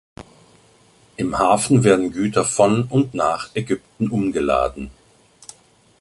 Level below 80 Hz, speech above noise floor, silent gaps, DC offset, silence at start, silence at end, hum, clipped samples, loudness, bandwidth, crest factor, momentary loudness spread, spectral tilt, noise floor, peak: -46 dBFS; 35 dB; none; under 0.1%; 0.2 s; 1.1 s; none; under 0.1%; -19 LUFS; 11.5 kHz; 18 dB; 11 LU; -5.5 dB/octave; -53 dBFS; -2 dBFS